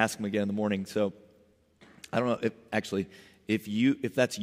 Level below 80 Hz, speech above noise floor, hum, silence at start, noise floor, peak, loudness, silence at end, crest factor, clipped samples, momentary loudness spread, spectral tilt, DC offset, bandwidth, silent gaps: -72 dBFS; 34 dB; none; 0 s; -64 dBFS; -8 dBFS; -30 LUFS; 0 s; 22 dB; under 0.1%; 7 LU; -5.5 dB/octave; under 0.1%; 15.5 kHz; none